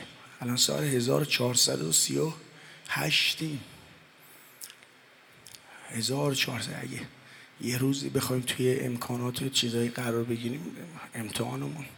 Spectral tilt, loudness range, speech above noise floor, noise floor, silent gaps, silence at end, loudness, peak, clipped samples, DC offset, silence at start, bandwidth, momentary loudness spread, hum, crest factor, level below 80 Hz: -3.5 dB/octave; 8 LU; 27 dB; -57 dBFS; none; 0 s; -28 LUFS; -10 dBFS; under 0.1%; under 0.1%; 0 s; 19.5 kHz; 21 LU; none; 22 dB; -70 dBFS